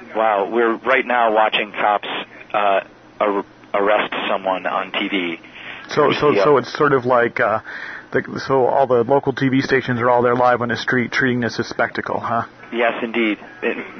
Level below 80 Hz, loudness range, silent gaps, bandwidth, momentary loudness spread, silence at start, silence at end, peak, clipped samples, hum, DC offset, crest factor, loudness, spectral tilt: -56 dBFS; 3 LU; none; 6.6 kHz; 9 LU; 0 s; 0 s; -2 dBFS; under 0.1%; none; under 0.1%; 16 dB; -18 LUFS; -6 dB/octave